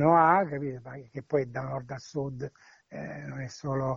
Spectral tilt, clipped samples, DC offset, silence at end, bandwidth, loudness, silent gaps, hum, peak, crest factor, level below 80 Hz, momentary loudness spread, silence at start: -7.5 dB/octave; under 0.1%; under 0.1%; 0 s; 7.6 kHz; -30 LUFS; none; none; -8 dBFS; 20 dB; -60 dBFS; 19 LU; 0 s